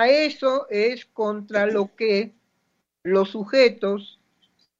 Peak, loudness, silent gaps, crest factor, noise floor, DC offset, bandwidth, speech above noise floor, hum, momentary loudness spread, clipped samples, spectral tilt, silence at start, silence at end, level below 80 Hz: -4 dBFS; -22 LUFS; none; 18 dB; -73 dBFS; under 0.1%; 7.6 kHz; 52 dB; none; 9 LU; under 0.1%; -5.5 dB/octave; 0 s; 0.75 s; -74 dBFS